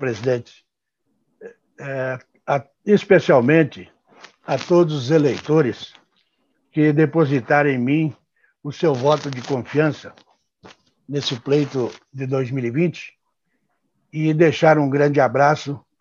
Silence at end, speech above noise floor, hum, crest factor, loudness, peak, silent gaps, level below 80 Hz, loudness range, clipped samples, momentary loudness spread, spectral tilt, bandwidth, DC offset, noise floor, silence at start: 0.25 s; 56 dB; none; 18 dB; -19 LUFS; -2 dBFS; none; -64 dBFS; 6 LU; under 0.1%; 16 LU; -7 dB/octave; 7.4 kHz; under 0.1%; -74 dBFS; 0 s